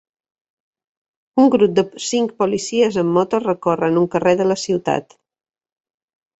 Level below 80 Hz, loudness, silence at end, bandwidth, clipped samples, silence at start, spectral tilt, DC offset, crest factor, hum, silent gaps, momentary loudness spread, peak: -60 dBFS; -18 LUFS; 1.35 s; 8.2 kHz; under 0.1%; 1.35 s; -5.5 dB/octave; under 0.1%; 16 dB; none; none; 6 LU; -2 dBFS